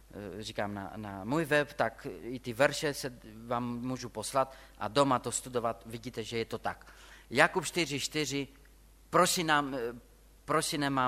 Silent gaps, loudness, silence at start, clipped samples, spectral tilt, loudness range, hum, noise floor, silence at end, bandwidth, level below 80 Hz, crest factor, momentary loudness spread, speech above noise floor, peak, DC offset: none; -32 LUFS; 0.15 s; under 0.1%; -3.5 dB/octave; 3 LU; none; -58 dBFS; 0 s; 16 kHz; -58 dBFS; 26 dB; 15 LU; 26 dB; -6 dBFS; under 0.1%